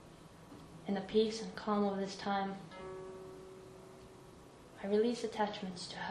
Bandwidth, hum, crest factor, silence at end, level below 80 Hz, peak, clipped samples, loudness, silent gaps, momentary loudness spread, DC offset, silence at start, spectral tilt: 12 kHz; none; 20 dB; 0 s; -68 dBFS; -20 dBFS; under 0.1%; -37 LUFS; none; 22 LU; under 0.1%; 0 s; -5.5 dB/octave